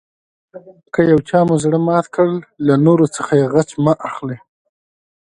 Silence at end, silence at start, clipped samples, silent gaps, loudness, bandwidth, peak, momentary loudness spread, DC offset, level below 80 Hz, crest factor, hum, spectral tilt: 0.85 s; 0.55 s; under 0.1%; none; -15 LUFS; 11 kHz; 0 dBFS; 11 LU; under 0.1%; -52 dBFS; 16 dB; none; -7.5 dB/octave